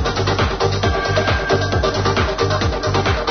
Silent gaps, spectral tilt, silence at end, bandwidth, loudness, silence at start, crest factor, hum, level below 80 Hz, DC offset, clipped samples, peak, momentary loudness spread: none; -5 dB/octave; 0 s; 6.6 kHz; -18 LUFS; 0 s; 14 dB; none; -28 dBFS; 0.3%; under 0.1%; -2 dBFS; 1 LU